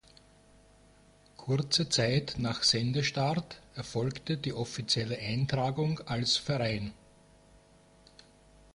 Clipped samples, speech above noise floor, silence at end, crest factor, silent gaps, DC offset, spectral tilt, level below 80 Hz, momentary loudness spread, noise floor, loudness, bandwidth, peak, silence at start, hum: under 0.1%; 30 dB; 1.8 s; 20 dB; none; under 0.1%; -4.5 dB/octave; -58 dBFS; 10 LU; -60 dBFS; -30 LUFS; 11.5 kHz; -14 dBFS; 1.4 s; 50 Hz at -55 dBFS